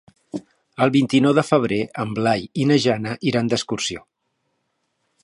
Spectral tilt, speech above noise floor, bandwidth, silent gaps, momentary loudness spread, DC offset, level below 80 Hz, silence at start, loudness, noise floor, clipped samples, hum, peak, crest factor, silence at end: -5.5 dB/octave; 53 dB; 11.5 kHz; none; 18 LU; under 0.1%; -58 dBFS; 0.35 s; -20 LUFS; -73 dBFS; under 0.1%; none; -2 dBFS; 20 dB; 1.25 s